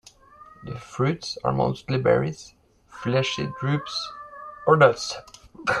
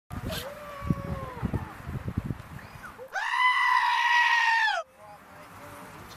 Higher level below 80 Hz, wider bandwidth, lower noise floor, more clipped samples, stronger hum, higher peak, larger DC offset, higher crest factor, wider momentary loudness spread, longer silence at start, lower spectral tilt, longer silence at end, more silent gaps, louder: second, -54 dBFS vs -46 dBFS; second, 11 kHz vs 15.5 kHz; about the same, -50 dBFS vs -50 dBFS; neither; neither; first, -2 dBFS vs -10 dBFS; neither; about the same, 22 dB vs 18 dB; second, 20 LU vs 23 LU; first, 0.6 s vs 0.1 s; first, -5.5 dB/octave vs -4 dB/octave; about the same, 0 s vs 0 s; neither; about the same, -24 LUFS vs -26 LUFS